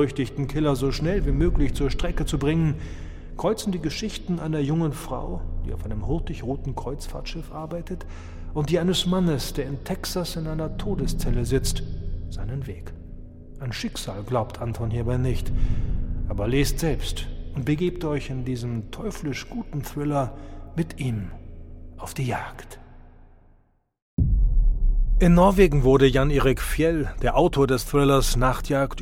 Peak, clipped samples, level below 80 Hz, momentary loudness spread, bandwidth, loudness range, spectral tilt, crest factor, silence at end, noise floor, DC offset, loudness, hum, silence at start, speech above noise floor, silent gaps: -4 dBFS; under 0.1%; -28 dBFS; 15 LU; 16 kHz; 11 LU; -6 dB/octave; 20 dB; 0 s; -61 dBFS; under 0.1%; -25 LUFS; none; 0 s; 37 dB; 24.02-24.17 s